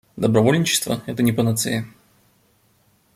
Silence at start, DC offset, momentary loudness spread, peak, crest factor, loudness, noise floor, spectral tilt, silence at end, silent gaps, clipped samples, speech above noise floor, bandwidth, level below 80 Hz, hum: 0.15 s; under 0.1%; 9 LU; -2 dBFS; 20 dB; -20 LUFS; -60 dBFS; -4.5 dB/octave; 1.25 s; none; under 0.1%; 41 dB; 16 kHz; -56 dBFS; none